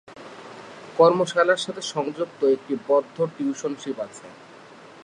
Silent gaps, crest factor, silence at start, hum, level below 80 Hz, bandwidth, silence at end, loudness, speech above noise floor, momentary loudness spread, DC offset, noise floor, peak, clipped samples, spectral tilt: none; 20 dB; 0.1 s; none; -76 dBFS; 11 kHz; 0 s; -23 LUFS; 23 dB; 23 LU; under 0.1%; -46 dBFS; -4 dBFS; under 0.1%; -4.5 dB/octave